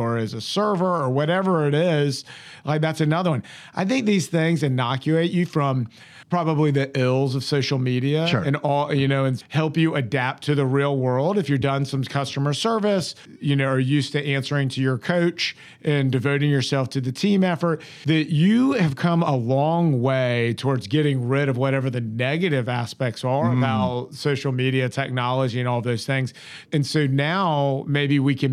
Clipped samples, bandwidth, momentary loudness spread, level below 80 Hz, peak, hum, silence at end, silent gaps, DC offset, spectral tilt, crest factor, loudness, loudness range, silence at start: under 0.1%; 12.5 kHz; 5 LU; -64 dBFS; -6 dBFS; none; 0 s; none; under 0.1%; -6.5 dB/octave; 16 dB; -22 LUFS; 2 LU; 0 s